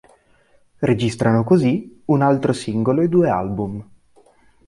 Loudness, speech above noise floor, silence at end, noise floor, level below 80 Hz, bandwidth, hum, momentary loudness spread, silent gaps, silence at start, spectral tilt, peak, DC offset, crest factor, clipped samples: -19 LUFS; 38 dB; 0.85 s; -56 dBFS; -50 dBFS; 11.5 kHz; none; 9 LU; none; 0.8 s; -7.5 dB/octave; -4 dBFS; under 0.1%; 16 dB; under 0.1%